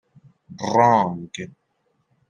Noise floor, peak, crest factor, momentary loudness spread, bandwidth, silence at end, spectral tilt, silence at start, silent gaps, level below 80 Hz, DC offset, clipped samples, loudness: -69 dBFS; -4 dBFS; 20 dB; 19 LU; 10.5 kHz; 0.85 s; -6 dB/octave; 0.5 s; none; -68 dBFS; under 0.1%; under 0.1%; -20 LUFS